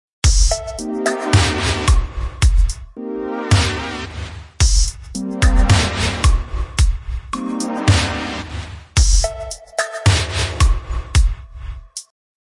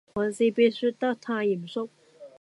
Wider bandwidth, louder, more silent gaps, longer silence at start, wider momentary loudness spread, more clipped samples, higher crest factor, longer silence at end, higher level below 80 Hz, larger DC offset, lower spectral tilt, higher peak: about the same, 11.5 kHz vs 11.5 kHz; first, -18 LUFS vs -26 LUFS; neither; about the same, 0.25 s vs 0.15 s; about the same, 14 LU vs 12 LU; neither; about the same, 16 dB vs 16 dB; first, 0.5 s vs 0.15 s; first, -20 dBFS vs -68 dBFS; neither; second, -4 dB/octave vs -5.5 dB/octave; first, -2 dBFS vs -10 dBFS